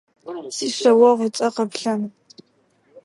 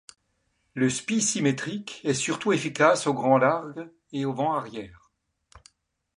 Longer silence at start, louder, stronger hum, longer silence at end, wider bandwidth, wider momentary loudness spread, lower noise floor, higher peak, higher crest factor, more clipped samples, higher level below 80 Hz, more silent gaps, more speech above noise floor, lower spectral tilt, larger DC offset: second, 0.25 s vs 0.75 s; first, -19 LUFS vs -25 LUFS; neither; second, 0.05 s vs 0.6 s; about the same, 11.5 kHz vs 11.5 kHz; about the same, 18 LU vs 18 LU; second, -62 dBFS vs -73 dBFS; first, -2 dBFS vs -6 dBFS; about the same, 18 dB vs 20 dB; neither; second, -78 dBFS vs -64 dBFS; neither; second, 44 dB vs 48 dB; about the same, -4 dB/octave vs -4 dB/octave; neither